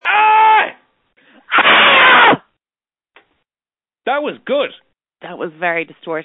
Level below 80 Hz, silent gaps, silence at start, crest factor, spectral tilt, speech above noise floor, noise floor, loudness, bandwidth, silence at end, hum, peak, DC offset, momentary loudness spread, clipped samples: -64 dBFS; none; 0.05 s; 14 dB; -6.5 dB/octave; over 69 dB; under -90 dBFS; -11 LUFS; 4.1 kHz; 0 s; none; 0 dBFS; under 0.1%; 18 LU; under 0.1%